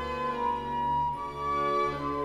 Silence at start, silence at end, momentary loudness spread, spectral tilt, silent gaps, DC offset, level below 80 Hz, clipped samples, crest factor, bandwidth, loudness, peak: 0 s; 0 s; 4 LU; -6 dB/octave; none; under 0.1%; -50 dBFS; under 0.1%; 12 dB; 14 kHz; -30 LUFS; -18 dBFS